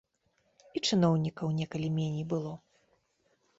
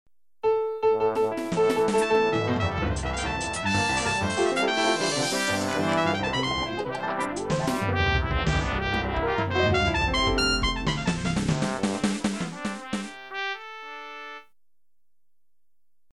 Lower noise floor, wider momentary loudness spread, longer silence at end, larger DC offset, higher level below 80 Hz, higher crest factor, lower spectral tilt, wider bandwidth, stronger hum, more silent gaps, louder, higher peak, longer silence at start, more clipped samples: second, -74 dBFS vs -87 dBFS; first, 14 LU vs 9 LU; second, 1 s vs 1.7 s; second, under 0.1% vs 0.2%; second, -68 dBFS vs -40 dBFS; about the same, 18 dB vs 16 dB; first, -6 dB/octave vs -4.5 dB/octave; second, 7.8 kHz vs 14 kHz; neither; neither; second, -31 LUFS vs -25 LUFS; second, -16 dBFS vs -10 dBFS; first, 0.75 s vs 0.45 s; neither